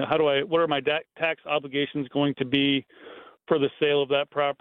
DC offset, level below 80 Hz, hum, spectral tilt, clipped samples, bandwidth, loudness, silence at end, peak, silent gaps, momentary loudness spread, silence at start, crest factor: under 0.1%; -68 dBFS; none; -8.5 dB/octave; under 0.1%; 4.2 kHz; -25 LUFS; 0.1 s; -6 dBFS; none; 6 LU; 0 s; 18 dB